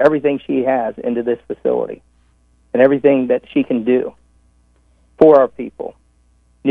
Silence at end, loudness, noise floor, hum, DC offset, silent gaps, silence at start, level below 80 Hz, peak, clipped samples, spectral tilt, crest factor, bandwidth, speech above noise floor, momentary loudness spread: 0 s; -16 LUFS; -55 dBFS; 60 Hz at -50 dBFS; under 0.1%; none; 0 s; -54 dBFS; 0 dBFS; under 0.1%; -8.5 dB/octave; 16 dB; 4.9 kHz; 40 dB; 17 LU